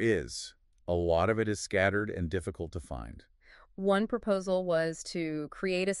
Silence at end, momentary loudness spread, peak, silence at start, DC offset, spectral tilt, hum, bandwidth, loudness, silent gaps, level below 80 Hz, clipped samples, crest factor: 0 s; 14 LU; -12 dBFS; 0 s; under 0.1%; -5.5 dB/octave; none; 12 kHz; -31 LUFS; none; -52 dBFS; under 0.1%; 20 dB